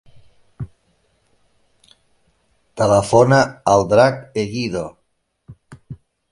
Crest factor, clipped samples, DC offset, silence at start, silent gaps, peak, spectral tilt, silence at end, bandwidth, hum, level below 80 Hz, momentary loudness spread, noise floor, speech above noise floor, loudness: 20 dB; under 0.1%; under 0.1%; 0.6 s; none; 0 dBFS; -5.5 dB/octave; 0.35 s; 11.5 kHz; none; -48 dBFS; 26 LU; -68 dBFS; 53 dB; -16 LUFS